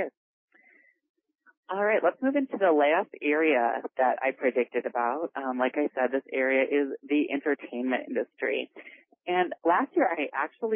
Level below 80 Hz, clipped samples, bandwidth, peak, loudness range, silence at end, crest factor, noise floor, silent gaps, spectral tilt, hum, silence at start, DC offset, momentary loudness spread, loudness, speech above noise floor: -86 dBFS; under 0.1%; 3.7 kHz; -12 dBFS; 3 LU; 0 s; 16 dB; -62 dBFS; 0.17-0.48 s, 1.09-1.14 s, 1.57-1.63 s; -8.5 dB/octave; none; 0 s; under 0.1%; 7 LU; -27 LUFS; 35 dB